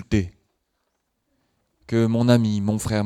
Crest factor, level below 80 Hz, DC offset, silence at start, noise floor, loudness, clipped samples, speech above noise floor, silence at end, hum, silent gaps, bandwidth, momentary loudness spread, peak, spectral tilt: 20 dB; -44 dBFS; under 0.1%; 0 s; -74 dBFS; -21 LUFS; under 0.1%; 55 dB; 0 s; none; none; 13.5 kHz; 8 LU; -4 dBFS; -6.5 dB/octave